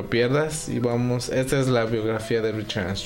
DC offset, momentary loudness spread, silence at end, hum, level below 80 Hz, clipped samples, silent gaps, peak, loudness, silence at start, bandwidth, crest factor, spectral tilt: under 0.1%; 5 LU; 0 s; none; -46 dBFS; under 0.1%; none; -8 dBFS; -24 LUFS; 0 s; 16.5 kHz; 14 dB; -5.5 dB/octave